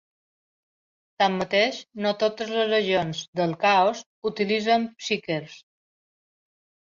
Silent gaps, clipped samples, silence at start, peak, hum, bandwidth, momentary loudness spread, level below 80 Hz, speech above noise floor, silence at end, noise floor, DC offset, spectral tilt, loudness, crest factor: 3.28-3.33 s, 4.06-4.22 s; under 0.1%; 1.2 s; -8 dBFS; none; 7.6 kHz; 10 LU; -68 dBFS; over 66 dB; 1.3 s; under -90 dBFS; under 0.1%; -4.5 dB/octave; -24 LUFS; 18 dB